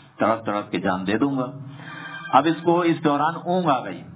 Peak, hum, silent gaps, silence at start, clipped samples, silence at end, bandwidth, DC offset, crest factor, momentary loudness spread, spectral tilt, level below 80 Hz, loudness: -2 dBFS; none; none; 0.2 s; under 0.1%; 0 s; 4 kHz; under 0.1%; 20 dB; 15 LU; -10.5 dB/octave; -60 dBFS; -22 LUFS